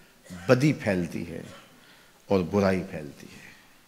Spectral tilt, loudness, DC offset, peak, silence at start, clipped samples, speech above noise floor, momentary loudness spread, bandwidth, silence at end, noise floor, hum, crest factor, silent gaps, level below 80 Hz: -7 dB/octave; -26 LUFS; under 0.1%; -4 dBFS; 0.3 s; under 0.1%; 29 dB; 23 LU; 16 kHz; 0.35 s; -55 dBFS; none; 24 dB; none; -60 dBFS